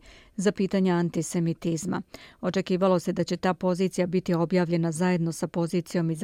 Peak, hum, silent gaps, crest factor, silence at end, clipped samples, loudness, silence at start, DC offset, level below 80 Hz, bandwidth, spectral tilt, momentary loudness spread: -12 dBFS; none; none; 14 dB; 0 s; under 0.1%; -26 LUFS; 0.05 s; under 0.1%; -60 dBFS; 14.5 kHz; -6.5 dB/octave; 6 LU